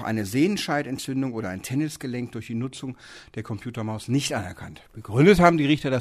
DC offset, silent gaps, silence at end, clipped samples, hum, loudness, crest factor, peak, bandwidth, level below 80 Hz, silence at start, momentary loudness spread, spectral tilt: under 0.1%; none; 0 s; under 0.1%; none; -24 LUFS; 22 dB; -2 dBFS; 15.5 kHz; -48 dBFS; 0 s; 20 LU; -6 dB/octave